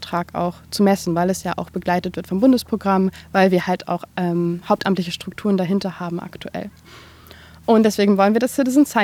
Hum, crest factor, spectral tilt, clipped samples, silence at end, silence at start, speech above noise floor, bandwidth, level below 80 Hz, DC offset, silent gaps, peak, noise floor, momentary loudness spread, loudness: none; 18 dB; -6 dB/octave; under 0.1%; 0 s; 0 s; 25 dB; 16.5 kHz; -54 dBFS; under 0.1%; none; -2 dBFS; -44 dBFS; 12 LU; -19 LUFS